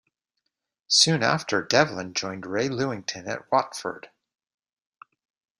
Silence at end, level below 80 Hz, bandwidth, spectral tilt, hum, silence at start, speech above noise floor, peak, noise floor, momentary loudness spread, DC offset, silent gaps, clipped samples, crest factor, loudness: 1.55 s; -66 dBFS; 13.5 kHz; -3 dB/octave; none; 0.9 s; 56 dB; -2 dBFS; -81 dBFS; 15 LU; under 0.1%; none; under 0.1%; 24 dB; -24 LUFS